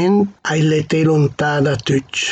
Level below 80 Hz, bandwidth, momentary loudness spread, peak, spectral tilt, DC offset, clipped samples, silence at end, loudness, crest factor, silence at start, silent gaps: -50 dBFS; 8.6 kHz; 3 LU; -4 dBFS; -5.5 dB/octave; under 0.1%; under 0.1%; 0 s; -16 LUFS; 12 dB; 0 s; none